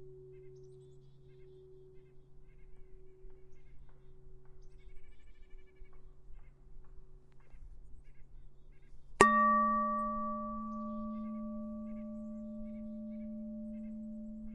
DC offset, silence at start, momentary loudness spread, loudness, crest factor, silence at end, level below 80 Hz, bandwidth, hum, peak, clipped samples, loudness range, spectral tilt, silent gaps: under 0.1%; 0 s; 29 LU; -35 LUFS; 36 dB; 0 s; -56 dBFS; 9.6 kHz; none; -2 dBFS; under 0.1%; 12 LU; -5 dB/octave; none